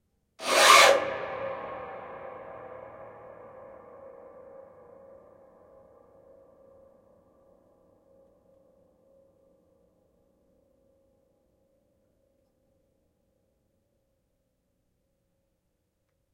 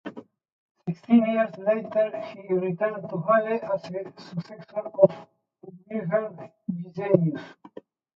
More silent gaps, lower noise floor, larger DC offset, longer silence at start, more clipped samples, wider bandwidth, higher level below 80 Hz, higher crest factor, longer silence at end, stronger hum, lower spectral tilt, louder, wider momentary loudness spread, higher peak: second, none vs 0.52-0.75 s; first, -77 dBFS vs -49 dBFS; neither; first, 0.4 s vs 0.05 s; neither; first, 16 kHz vs 6 kHz; about the same, -72 dBFS vs -74 dBFS; about the same, 28 dB vs 24 dB; first, 13.3 s vs 0.65 s; neither; second, 0 dB/octave vs -9.5 dB/octave; first, -21 LUFS vs -26 LUFS; first, 33 LU vs 16 LU; about the same, -4 dBFS vs -2 dBFS